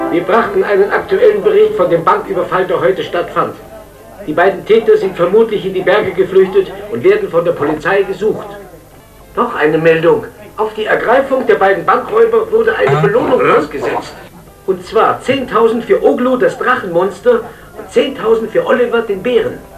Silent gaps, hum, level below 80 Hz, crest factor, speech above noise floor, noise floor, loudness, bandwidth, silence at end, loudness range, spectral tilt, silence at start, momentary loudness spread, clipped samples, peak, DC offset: none; none; -44 dBFS; 12 dB; 27 dB; -38 dBFS; -12 LUFS; 14 kHz; 0 s; 3 LU; -6.5 dB/octave; 0 s; 9 LU; under 0.1%; 0 dBFS; under 0.1%